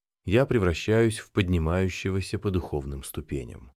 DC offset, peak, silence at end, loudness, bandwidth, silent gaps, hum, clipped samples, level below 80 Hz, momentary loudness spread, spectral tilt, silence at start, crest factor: under 0.1%; -8 dBFS; 0.05 s; -27 LUFS; 15 kHz; none; none; under 0.1%; -40 dBFS; 12 LU; -6.5 dB/octave; 0.25 s; 18 dB